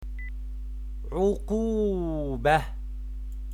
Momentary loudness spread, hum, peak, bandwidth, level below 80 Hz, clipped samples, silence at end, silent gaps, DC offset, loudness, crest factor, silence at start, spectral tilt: 15 LU; none; -10 dBFS; 13 kHz; -34 dBFS; under 0.1%; 0 s; none; under 0.1%; -29 LUFS; 18 dB; 0 s; -7 dB/octave